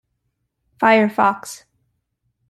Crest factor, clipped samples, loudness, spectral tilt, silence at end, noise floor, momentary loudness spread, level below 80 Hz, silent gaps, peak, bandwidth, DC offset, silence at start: 18 dB; under 0.1%; -16 LUFS; -5 dB/octave; 0.95 s; -73 dBFS; 21 LU; -64 dBFS; none; -2 dBFS; 13 kHz; under 0.1%; 0.8 s